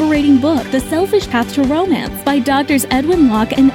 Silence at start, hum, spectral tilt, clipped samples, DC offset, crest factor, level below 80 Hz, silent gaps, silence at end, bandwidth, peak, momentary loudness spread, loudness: 0 s; none; -5 dB/octave; under 0.1%; under 0.1%; 12 dB; -36 dBFS; none; 0 s; 17.5 kHz; -2 dBFS; 5 LU; -14 LUFS